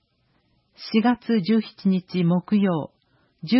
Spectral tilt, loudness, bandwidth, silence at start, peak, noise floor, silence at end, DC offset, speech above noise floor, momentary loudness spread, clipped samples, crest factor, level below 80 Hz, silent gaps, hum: -11 dB/octave; -22 LUFS; 5.8 kHz; 0.8 s; -6 dBFS; -67 dBFS; 0 s; under 0.1%; 45 dB; 14 LU; under 0.1%; 16 dB; -66 dBFS; none; none